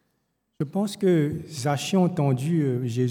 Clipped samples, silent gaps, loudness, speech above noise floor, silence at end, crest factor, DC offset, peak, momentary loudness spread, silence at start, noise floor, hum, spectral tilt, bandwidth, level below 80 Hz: under 0.1%; none; -25 LUFS; 50 dB; 0 s; 14 dB; under 0.1%; -10 dBFS; 7 LU; 0.6 s; -74 dBFS; none; -6.5 dB/octave; 19.5 kHz; -64 dBFS